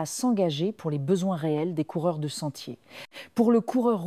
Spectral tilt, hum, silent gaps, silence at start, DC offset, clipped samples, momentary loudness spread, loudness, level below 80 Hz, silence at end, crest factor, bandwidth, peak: -6 dB/octave; none; none; 0 s; under 0.1%; under 0.1%; 18 LU; -27 LUFS; -74 dBFS; 0 s; 16 dB; 14.5 kHz; -10 dBFS